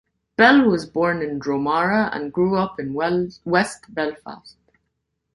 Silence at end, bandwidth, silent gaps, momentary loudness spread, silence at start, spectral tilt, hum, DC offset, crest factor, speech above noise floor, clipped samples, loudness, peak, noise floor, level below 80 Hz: 0.85 s; 11.5 kHz; none; 12 LU; 0.4 s; -6 dB/octave; none; under 0.1%; 20 dB; 56 dB; under 0.1%; -20 LUFS; -2 dBFS; -76 dBFS; -54 dBFS